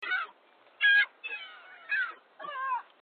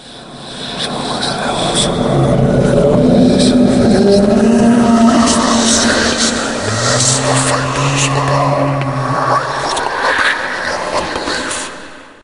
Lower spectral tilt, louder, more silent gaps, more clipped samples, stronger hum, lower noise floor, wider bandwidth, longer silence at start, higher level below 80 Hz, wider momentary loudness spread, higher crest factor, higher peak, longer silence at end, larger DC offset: second, -1 dB/octave vs -4 dB/octave; second, -28 LUFS vs -12 LUFS; neither; neither; neither; first, -61 dBFS vs -33 dBFS; second, 4.7 kHz vs 11.5 kHz; about the same, 0 s vs 0 s; second, under -90 dBFS vs -34 dBFS; first, 21 LU vs 9 LU; about the same, 16 dB vs 12 dB; second, -14 dBFS vs 0 dBFS; about the same, 0.2 s vs 0.2 s; neither